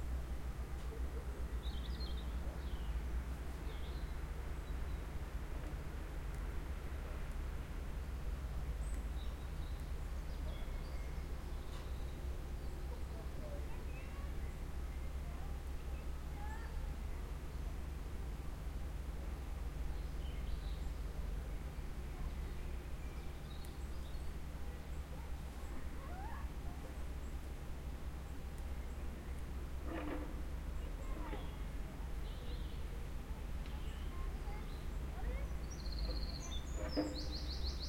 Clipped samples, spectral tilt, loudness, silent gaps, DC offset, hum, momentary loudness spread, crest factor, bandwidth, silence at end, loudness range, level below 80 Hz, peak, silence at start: under 0.1%; -6 dB/octave; -46 LUFS; none; under 0.1%; none; 4 LU; 18 dB; 16.5 kHz; 0 s; 3 LU; -44 dBFS; -26 dBFS; 0 s